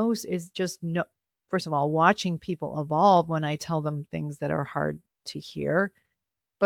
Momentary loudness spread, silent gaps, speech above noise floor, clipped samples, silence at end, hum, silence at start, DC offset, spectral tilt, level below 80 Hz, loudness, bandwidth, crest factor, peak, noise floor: 12 LU; none; 58 dB; under 0.1%; 0 s; none; 0 s; under 0.1%; -6 dB/octave; -64 dBFS; -27 LUFS; 17 kHz; 22 dB; -4 dBFS; -85 dBFS